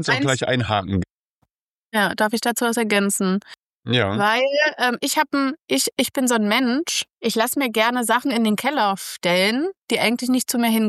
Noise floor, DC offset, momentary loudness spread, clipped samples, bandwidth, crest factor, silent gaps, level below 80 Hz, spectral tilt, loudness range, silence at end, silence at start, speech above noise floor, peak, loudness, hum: -71 dBFS; under 0.1%; 5 LU; under 0.1%; 15 kHz; 18 dB; 1.10-1.42 s, 1.51-1.89 s, 3.58-3.82 s, 5.64-5.68 s, 7.13-7.17 s, 9.84-9.88 s; -56 dBFS; -3.5 dB/octave; 2 LU; 0 s; 0 s; 51 dB; -2 dBFS; -20 LUFS; none